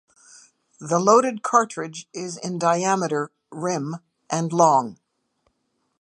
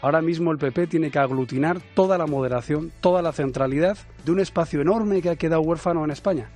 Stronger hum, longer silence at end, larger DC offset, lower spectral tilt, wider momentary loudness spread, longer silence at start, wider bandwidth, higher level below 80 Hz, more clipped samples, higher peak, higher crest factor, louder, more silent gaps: neither; first, 1.05 s vs 0.05 s; neither; second, -5 dB/octave vs -7.5 dB/octave; first, 16 LU vs 4 LU; first, 0.8 s vs 0 s; first, 11 kHz vs 9.6 kHz; second, -76 dBFS vs -48 dBFS; neither; first, -2 dBFS vs -6 dBFS; about the same, 20 dB vs 18 dB; about the same, -22 LUFS vs -23 LUFS; neither